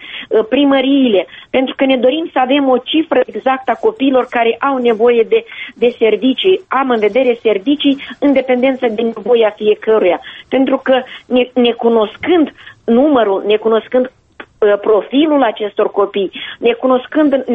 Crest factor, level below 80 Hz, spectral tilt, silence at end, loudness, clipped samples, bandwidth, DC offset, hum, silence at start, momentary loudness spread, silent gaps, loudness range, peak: 12 dB; -54 dBFS; -7 dB/octave; 0 s; -13 LUFS; under 0.1%; 4 kHz; under 0.1%; none; 0 s; 5 LU; none; 1 LU; 0 dBFS